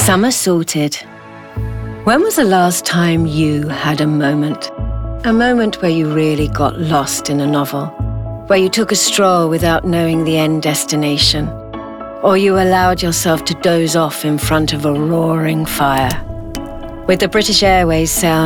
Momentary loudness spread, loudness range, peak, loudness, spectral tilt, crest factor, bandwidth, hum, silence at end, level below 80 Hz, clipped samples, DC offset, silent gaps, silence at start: 12 LU; 2 LU; 0 dBFS; -14 LUFS; -4.5 dB/octave; 14 dB; 19.5 kHz; none; 0 s; -32 dBFS; under 0.1%; under 0.1%; none; 0 s